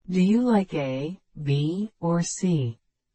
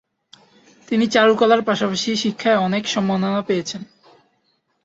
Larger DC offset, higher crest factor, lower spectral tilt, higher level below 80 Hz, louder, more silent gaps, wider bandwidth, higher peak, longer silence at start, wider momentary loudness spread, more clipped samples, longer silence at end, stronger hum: neither; about the same, 14 dB vs 18 dB; first, -6.5 dB/octave vs -4.5 dB/octave; about the same, -58 dBFS vs -62 dBFS; second, -25 LUFS vs -18 LUFS; neither; about the same, 8.8 kHz vs 8 kHz; second, -10 dBFS vs -2 dBFS; second, 0.1 s vs 0.9 s; about the same, 11 LU vs 9 LU; neither; second, 0.4 s vs 1 s; neither